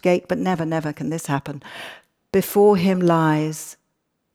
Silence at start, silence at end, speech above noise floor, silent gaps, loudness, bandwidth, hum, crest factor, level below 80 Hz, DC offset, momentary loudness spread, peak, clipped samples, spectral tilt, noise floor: 0.05 s; 0.6 s; 53 dB; none; -20 LUFS; 18 kHz; none; 16 dB; -58 dBFS; under 0.1%; 19 LU; -4 dBFS; under 0.1%; -6.5 dB/octave; -73 dBFS